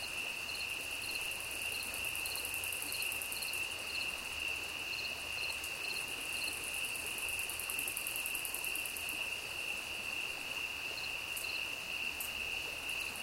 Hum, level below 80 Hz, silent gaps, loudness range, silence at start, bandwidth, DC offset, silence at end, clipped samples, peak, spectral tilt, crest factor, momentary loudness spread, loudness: none; -62 dBFS; none; 1 LU; 0 s; 17 kHz; under 0.1%; 0 s; under 0.1%; -18 dBFS; 0 dB/octave; 22 dB; 2 LU; -37 LUFS